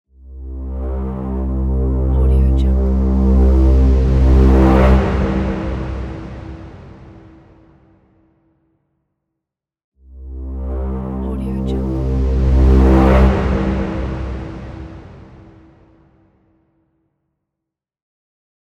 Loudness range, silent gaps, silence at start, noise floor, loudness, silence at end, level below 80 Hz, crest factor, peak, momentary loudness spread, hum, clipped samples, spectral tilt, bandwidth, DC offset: 18 LU; 9.84-9.92 s; 0.25 s; -82 dBFS; -16 LUFS; 3.5 s; -18 dBFS; 16 dB; 0 dBFS; 21 LU; none; under 0.1%; -9.5 dB/octave; 5.2 kHz; under 0.1%